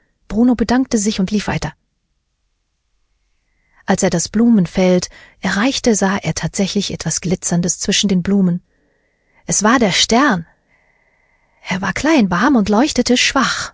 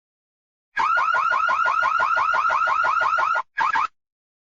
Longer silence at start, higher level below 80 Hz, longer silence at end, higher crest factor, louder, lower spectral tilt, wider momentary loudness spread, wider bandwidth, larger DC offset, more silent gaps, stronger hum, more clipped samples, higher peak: second, 0.3 s vs 0.75 s; first, -42 dBFS vs -62 dBFS; second, 0.05 s vs 0.55 s; about the same, 16 dB vs 12 dB; first, -15 LUFS vs -20 LUFS; first, -4 dB/octave vs -1.5 dB/octave; first, 10 LU vs 4 LU; about the same, 8 kHz vs 7.6 kHz; neither; neither; neither; neither; first, 0 dBFS vs -10 dBFS